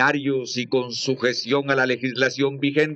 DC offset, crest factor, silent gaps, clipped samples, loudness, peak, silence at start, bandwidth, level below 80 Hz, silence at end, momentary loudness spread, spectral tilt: under 0.1%; 18 dB; none; under 0.1%; -22 LUFS; -4 dBFS; 0 s; 8.2 kHz; -76 dBFS; 0 s; 4 LU; -4.5 dB/octave